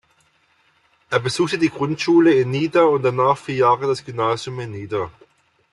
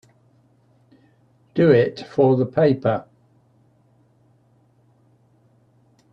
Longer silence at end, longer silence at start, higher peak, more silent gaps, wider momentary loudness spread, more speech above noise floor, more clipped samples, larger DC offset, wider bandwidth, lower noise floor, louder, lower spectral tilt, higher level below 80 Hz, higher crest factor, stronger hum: second, 0.6 s vs 3.1 s; second, 1.1 s vs 1.55 s; about the same, -4 dBFS vs -2 dBFS; neither; about the same, 11 LU vs 10 LU; about the same, 42 dB vs 41 dB; neither; neither; first, 12 kHz vs 7 kHz; about the same, -61 dBFS vs -59 dBFS; about the same, -19 LUFS vs -19 LUFS; second, -6 dB/octave vs -9 dB/octave; about the same, -60 dBFS vs -64 dBFS; second, 16 dB vs 22 dB; neither